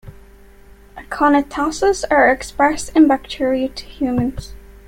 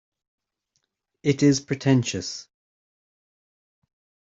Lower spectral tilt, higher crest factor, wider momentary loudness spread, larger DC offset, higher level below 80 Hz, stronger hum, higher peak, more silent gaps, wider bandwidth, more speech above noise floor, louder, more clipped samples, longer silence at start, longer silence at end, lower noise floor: about the same, -5 dB/octave vs -5.5 dB/octave; second, 16 dB vs 22 dB; about the same, 10 LU vs 12 LU; neither; first, -40 dBFS vs -62 dBFS; neither; first, -2 dBFS vs -6 dBFS; neither; first, 16 kHz vs 7.8 kHz; second, 27 dB vs 54 dB; first, -17 LUFS vs -23 LUFS; neither; second, 0.05 s vs 1.25 s; second, 0.15 s vs 1.9 s; second, -44 dBFS vs -76 dBFS